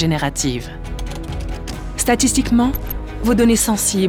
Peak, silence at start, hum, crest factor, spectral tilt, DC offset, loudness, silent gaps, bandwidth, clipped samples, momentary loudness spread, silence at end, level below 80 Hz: -2 dBFS; 0 s; none; 16 dB; -4 dB/octave; under 0.1%; -18 LUFS; none; 20 kHz; under 0.1%; 14 LU; 0 s; -28 dBFS